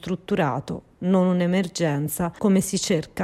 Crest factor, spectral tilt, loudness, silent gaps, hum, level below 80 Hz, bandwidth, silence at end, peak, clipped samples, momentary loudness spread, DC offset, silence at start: 14 dB; -5.5 dB/octave; -23 LUFS; none; none; -54 dBFS; 15.5 kHz; 0 s; -8 dBFS; under 0.1%; 7 LU; under 0.1%; 0.05 s